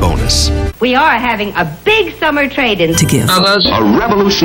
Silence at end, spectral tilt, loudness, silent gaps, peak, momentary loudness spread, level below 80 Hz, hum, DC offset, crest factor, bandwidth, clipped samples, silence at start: 0 s; -4 dB/octave; -11 LUFS; none; 0 dBFS; 5 LU; -24 dBFS; none; under 0.1%; 10 dB; 17 kHz; under 0.1%; 0 s